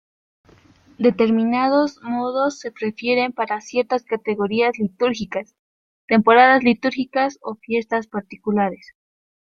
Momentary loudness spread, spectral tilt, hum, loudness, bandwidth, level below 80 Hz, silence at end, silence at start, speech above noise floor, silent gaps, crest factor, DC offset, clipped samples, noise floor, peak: 13 LU; -5.5 dB/octave; none; -20 LUFS; 7.4 kHz; -62 dBFS; 0.7 s; 1 s; 33 dB; 5.59-6.08 s; 18 dB; under 0.1%; under 0.1%; -52 dBFS; -2 dBFS